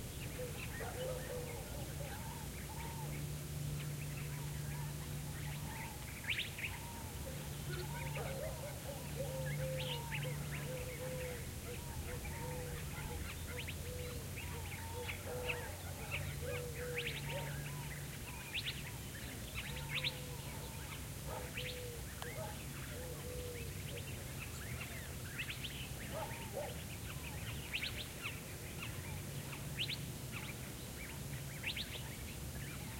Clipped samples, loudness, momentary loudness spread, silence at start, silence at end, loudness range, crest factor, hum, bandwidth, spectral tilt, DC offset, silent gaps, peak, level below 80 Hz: under 0.1%; -44 LUFS; 5 LU; 0 s; 0 s; 2 LU; 18 dB; none; 16.5 kHz; -4 dB/octave; under 0.1%; none; -26 dBFS; -54 dBFS